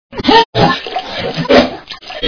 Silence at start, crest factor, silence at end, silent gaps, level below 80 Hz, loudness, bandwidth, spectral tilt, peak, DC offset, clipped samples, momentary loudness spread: 0.1 s; 14 dB; 0 s; 0.45-0.53 s; -36 dBFS; -12 LUFS; 5.4 kHz; -5.5 dB/octave; 0 dBFS; under 0.1%; 0.8%; 12 LU